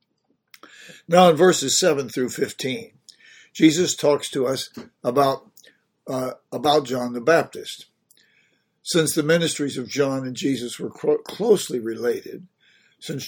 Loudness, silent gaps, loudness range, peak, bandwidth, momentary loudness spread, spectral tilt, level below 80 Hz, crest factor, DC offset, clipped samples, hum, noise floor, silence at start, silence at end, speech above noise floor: -21 LUFS; none; 5 LU; 0 dBFS; 19 kHz; 16 LU; -4 dB/octave; -66 dBFS; 22 dB; under 0.1%; under 0.1%; none; -70 dBFS; 0.8 s; 0 s; 49 dB